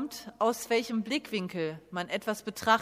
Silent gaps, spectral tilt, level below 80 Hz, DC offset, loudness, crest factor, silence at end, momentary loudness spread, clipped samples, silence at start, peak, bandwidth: none; -4 dB/octave; -70 dBFS; under 0.1%; -32 LUFS; 20 dB; 0 s; 8 LU; under 0.1%; 0 s; -10 dBFS; 15.5 kHz